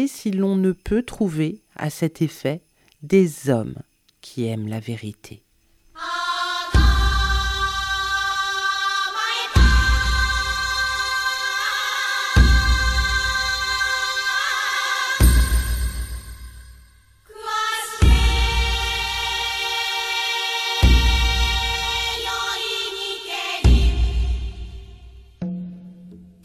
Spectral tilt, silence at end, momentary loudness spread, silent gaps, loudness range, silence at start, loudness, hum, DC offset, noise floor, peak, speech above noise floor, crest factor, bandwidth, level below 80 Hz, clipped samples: -4 dB/octave; 0.2 s; 13 LU; none; 5 LU; 0 s; -21 LUFS; none; under 0.1%; -58 dBFS; -2 dBFS; 35 dB; 20 dB; 14.5 kHz; -24 dBFS; under 0.1%